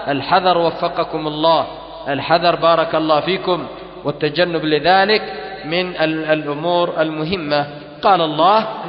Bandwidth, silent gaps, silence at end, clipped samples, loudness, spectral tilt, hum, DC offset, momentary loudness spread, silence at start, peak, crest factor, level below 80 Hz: 5.8 kHz; none; 0 s; under 0.1%; -17 LUFS; -9.5 dB/octave; none; under 0.1%; 10 LU; 0 s; 0 dBFS; 16 dB; -50 dBFS